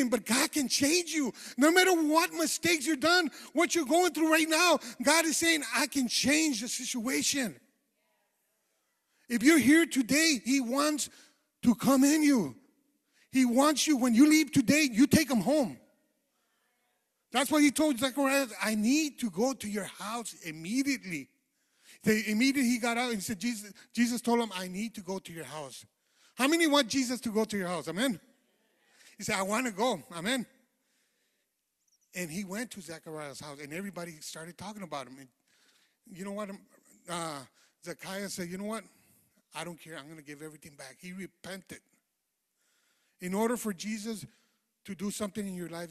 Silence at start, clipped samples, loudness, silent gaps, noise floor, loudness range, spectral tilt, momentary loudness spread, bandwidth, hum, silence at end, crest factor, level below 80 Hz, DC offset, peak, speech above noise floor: 0 s; under 0.1%; -28 LUFS; none; -82 dBFS; 16 LU; -3 dB/octave; 19 LU; 15 kHz; none; 0 s; 22 dB; -68 dBFS; under 0.1%; -8 dBFS; 53 dB